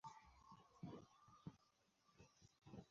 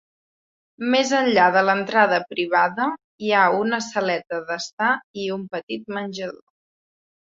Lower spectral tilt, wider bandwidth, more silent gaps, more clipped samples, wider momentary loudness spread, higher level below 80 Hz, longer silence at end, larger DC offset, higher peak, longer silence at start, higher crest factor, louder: first, -6.5 dB/octave vs -4 dB/octave; about the same, 7.4 kHz vs 7.8 kHz; second, none vs 3.04-3.18 s, 4.73-4.77 s, 5.04-5.14 s, 5.63-5.67 s; neither; second, 9 LU vs 13 LU; second, -80 dBFS vs -70 dBFS; second, 0 s vs 0.9 s; neither; second, -42 dBFS vs -2 dBFS; second, 0.05 s vs 0.8 s; about the same, 20 dB vs 20 dB; second, -63 LUFS vs -21 LUFS